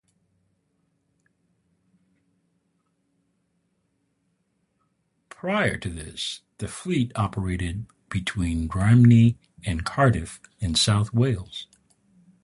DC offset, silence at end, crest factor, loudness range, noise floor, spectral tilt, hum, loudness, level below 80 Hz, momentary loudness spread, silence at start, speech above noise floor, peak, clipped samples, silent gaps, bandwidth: under 0.1%; 0.8 s; 20 dB; 11 LU; -72 dBFS; -5.5 dB/octave; none; -23 LUFS; -42 dBFS; 17 LU; 5.45 s; 50 dB; -6 dBFS; under 0.1%; none; 11.5 kHz